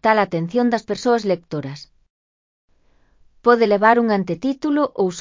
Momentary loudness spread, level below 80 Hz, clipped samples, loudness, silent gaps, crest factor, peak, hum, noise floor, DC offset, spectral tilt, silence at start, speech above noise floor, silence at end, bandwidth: 12 LU; -60 dBFS; under 0.1%; -19 LUFS; 2.10-2.68 s; 20 dB; 0 dBFS; none; -57 dBFS; under 0.1%; -6 dB/octave; 0.05 s; 39 dB; 0 s; 7.6 kHz